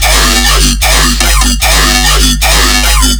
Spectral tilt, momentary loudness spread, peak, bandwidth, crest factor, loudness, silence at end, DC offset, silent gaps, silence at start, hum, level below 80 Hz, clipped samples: -2 dB/octave; 1 LU; 0 dBFS; over 20 kHz; 8 dB; -6 LUFS; 0 s; under 0.1%; none; 0 s; none; -10 dBFS; 2%